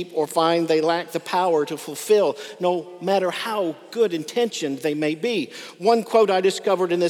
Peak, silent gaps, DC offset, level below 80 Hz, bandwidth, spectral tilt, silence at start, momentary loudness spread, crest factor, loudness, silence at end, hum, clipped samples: -4 dBFS; none; under 0.1%; -86 dBFS; 17 kHz; -4.5 dB/octave; 0 s; 7 LU; 16 dB; -22 LUFS; 0 s; none; under 0.1%